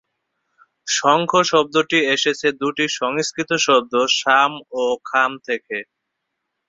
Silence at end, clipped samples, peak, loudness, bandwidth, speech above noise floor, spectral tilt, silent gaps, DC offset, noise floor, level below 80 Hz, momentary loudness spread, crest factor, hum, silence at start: 0.85 s; under 0.1%; -2 dBFS; -18 LUFS; 7.8 kHz; 59 dB; -2.5 dB/octave; none; under 0.1%; -77 dBFS; -64 dBFS; 9 LU; 18 dB; none; 0.85 s